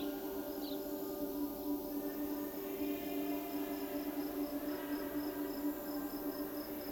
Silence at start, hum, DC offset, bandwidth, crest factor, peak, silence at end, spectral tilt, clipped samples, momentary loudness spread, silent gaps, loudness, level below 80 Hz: 0 s; none; under 0.1%; 19.5 kHz; 14 dB; -28 dBFS; 0 s; -4.5 dB/octave; under 0.1%; 2 LU; none; -41 LUFS; -64 dBFS